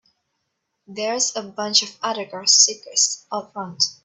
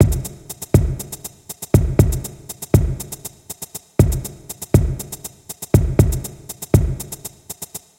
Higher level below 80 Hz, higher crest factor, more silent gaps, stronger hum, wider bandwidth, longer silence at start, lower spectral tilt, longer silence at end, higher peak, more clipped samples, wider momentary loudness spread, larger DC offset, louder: second, -74 dBFS vs -26 dBFS; about the same, 22 dB vs 20 dB; neither; neither; second, 8.6 kHz vs 17 kHz; first, 0.9 s vs 0 s; second, 0 dB/octave vs -6.5 dB/octave; about the same, 0.1 s vs 0.2 s; about the same, -2 dBFS vs 0 dBFS; neither; about the same, 16 LU vs 15 LU; neither; about the same, -19 LUFS vs -19 LUFS